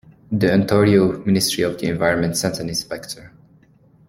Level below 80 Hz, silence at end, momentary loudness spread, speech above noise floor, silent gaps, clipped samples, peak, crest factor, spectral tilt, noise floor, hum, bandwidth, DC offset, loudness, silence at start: -50 dBFS; 0.8 s; 14 LU; 34 dB; none; under 0.1%; -2 dBFS; 18 dB; -5 dB/octave; -53 dBFS; none; 16.5 kHz; under 0.1%; -18 LUFS; 0.3 s